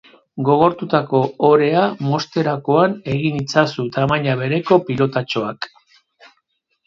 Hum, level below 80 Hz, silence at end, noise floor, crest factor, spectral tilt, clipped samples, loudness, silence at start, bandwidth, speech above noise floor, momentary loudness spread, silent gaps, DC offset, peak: none; -54 dBFS; 1.2 s; -68 dBFS; 18 dB; -7 dB/octave; under 0.1%; -18 LUFS; 0.35 s; 7.6 kHz; 52 dB; 8 LU; none; under 0.1%; 0 dBFS